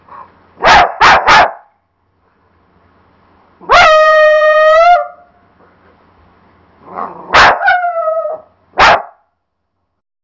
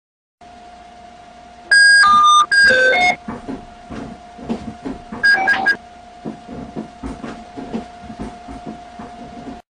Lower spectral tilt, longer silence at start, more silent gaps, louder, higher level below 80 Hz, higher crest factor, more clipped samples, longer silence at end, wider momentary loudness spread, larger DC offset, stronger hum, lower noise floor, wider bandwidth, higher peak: about the same, -2.5 dB/octave vs -1.5 dB/octave; second, 0.1 s vs 1.7 s; neither; first, -8 LUFS vs -11 LUFS; first, -38 dBFS vs -46 dBFS; about the same, 12 dB vs 12 dB; neither; first, 1.2 s vs 0.1 s; second, 19 LU vs 25 LU; neither; neither; first, -69 dBFS vs -40 dBFS; second, 7.6 kHz vs 10 kHz; first, 0 dBFS vs -6 dBFS